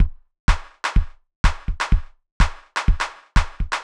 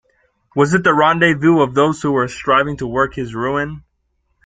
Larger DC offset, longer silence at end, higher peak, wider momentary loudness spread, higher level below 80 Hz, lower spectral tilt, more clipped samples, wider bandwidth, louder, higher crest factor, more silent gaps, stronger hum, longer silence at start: neither; second, 0 s vs 0.65 s; about the same, -2 dBFS vs 0 dBFS; second, 3 LU vs 9 LU; first, -22 dBFS vs -46 dBFS; second, -4.5 dB/octave vs -6 dB/octave; neither; first, 10.5 kHz vs 9.4 kHz; second, -24 LUFS vs -16 LUFS; about the same, 18 dB vs 16 dB; first, 0.40-0.48 s, 1.36-1.44 s, 2.32-2.40 s vs none; neither; second, 0 s vs 0.55 s